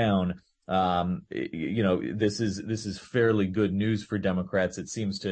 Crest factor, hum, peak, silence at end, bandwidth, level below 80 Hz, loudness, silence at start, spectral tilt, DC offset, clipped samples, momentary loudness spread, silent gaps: 14 dB; none; -12 dBFS; 0 s; 8.8 kHz; -58 dBFS; -28 LUFS; 0 s; -6 dB/octave; under 0.1%; under 0.1%; 8 LU; none